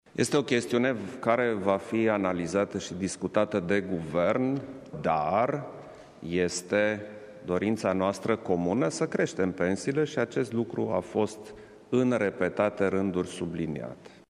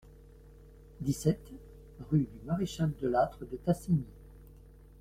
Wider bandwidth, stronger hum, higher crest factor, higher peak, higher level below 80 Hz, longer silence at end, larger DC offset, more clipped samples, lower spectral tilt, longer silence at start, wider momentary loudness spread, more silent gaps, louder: second, 13 kHz vs 15.5 kHz; neither; about the same, 20 dB vs 20 dB; first, -8 dBFS vs -14 dBFS; second, -62 dBFS vs -54 dBFS; second, 0.15 s vs 0.55 s; neither; neither; second, -5.5 dB/octave vs -7.5 dB/octave; about the same, 0.15 s vs 0.05 s; second, 9 LU vs 20 LU; neither; first, -28 LUFS vs -33 LUFS